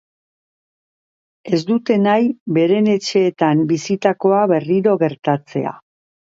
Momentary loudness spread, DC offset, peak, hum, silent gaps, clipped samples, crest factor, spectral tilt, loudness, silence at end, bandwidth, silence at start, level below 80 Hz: 6 LU; under 0.1%; 0 dBFS; none; 2.40-2.46 s, 5.19-5.23 s; under 0.1%; 16 dB; -6.5 dB/octave; -17 LUFS; 0.55 s; 7.8 kHz; 1.45 s; -66 dBFS